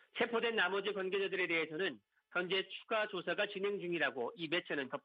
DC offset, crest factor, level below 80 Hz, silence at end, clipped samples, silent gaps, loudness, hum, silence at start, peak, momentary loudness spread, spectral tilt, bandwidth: under 0.1%; 16 dB; -88 dBFS; 0.05 s; under 0.1%; none; -37 LUFS; none; 0.15 s; -22 dBFS; 6 LU; -6.5 dB/octave; 5.4 kHz